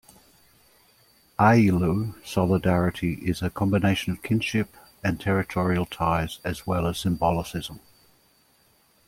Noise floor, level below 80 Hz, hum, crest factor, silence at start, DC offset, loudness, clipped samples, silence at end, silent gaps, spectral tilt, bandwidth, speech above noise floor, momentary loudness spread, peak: -62 dBFS; -48 dBFS; none; 20 dB; 1.4 s; under 0.1%; -25 LUFS; under 0.1%; 1.3 s; none; -6.5 dB/octave; 16.5 kHz; 38 dB; 10 LU; -4 dBFS